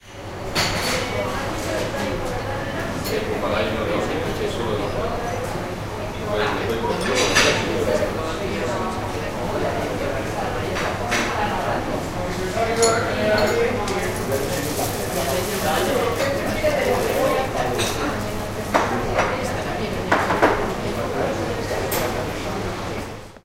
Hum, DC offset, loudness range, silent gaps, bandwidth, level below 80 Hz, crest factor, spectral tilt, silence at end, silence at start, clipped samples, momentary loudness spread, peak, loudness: none; under 0.1%; 3 LU; none; 16 kHz; -36 dBFS; 22 dB; -4 dB/octave; 0.05 s; 0.05 s; under 0.1%; 8 LU; 0 dBFS; -22 LUFS